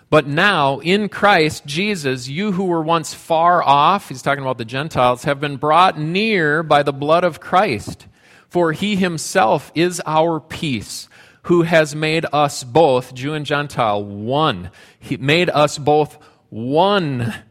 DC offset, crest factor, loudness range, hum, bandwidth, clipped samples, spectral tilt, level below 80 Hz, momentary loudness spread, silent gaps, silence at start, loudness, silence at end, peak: under 0.1%; 18 dB; 3 LU; none; 16 kHz; under 0.1%; -5 dB/octave; -52 dBFS; 10 LU; none; 0.1 s; -17 LUFS; 0.1 s; 0 dBFS